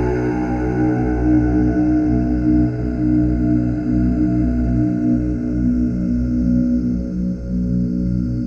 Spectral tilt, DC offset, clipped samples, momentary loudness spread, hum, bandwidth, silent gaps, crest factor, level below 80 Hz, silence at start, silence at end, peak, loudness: -10.5 dB/octave; under 0.1%; under 0.1%; 4 LU; 60 Hz at -30 dBFS; 6.8 kHz; none; 12 dB; -26 dBFS; 0 s; 0 s; -4 dBFS; -18 LUFS